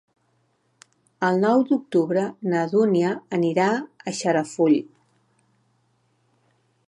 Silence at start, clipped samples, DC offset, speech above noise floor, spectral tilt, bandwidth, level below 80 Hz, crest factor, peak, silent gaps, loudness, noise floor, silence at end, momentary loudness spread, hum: 1.2 s; under 0.1%; under 0.1%; 46 dB; -6 dB/octave; 11.5 kHz; -76 dBFS; 18 dB; -6 dBFS; none; -22 LUFS; -67 dBFS; 2.05 s; 7 LU; none